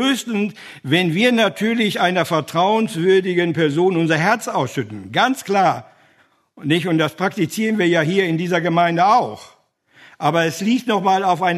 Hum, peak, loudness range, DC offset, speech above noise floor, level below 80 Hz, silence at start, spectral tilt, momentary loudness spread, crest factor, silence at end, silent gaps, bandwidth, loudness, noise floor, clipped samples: none; -2 dBFS; 3 LU; under 0.1%; 40 dB; -66 dBFS; 0 s; -5.5 dB/octave; 7 LU; 16 dB; 0 s; none; 13.5 kHz; -18 LUFS; -58 dBFS; under 0.1%